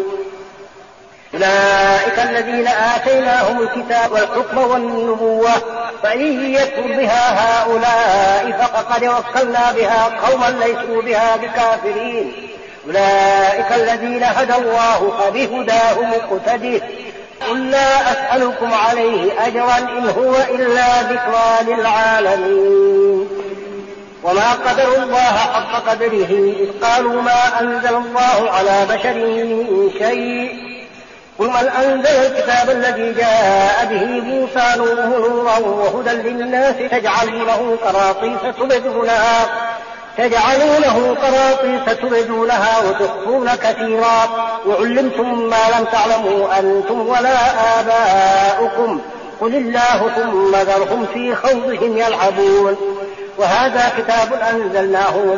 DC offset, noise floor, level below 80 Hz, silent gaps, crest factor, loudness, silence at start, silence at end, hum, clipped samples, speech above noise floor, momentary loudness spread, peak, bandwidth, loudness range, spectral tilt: under 0.1%; -41 dBFS; -48 dBFS; none; 12 dB; -14 LUFS; 0 s; 0 s; none; under 0.1%; 27 dB; 7 LU; -2 dBFS; 7.4 kHz; 2 LU; -1.5 dB/octave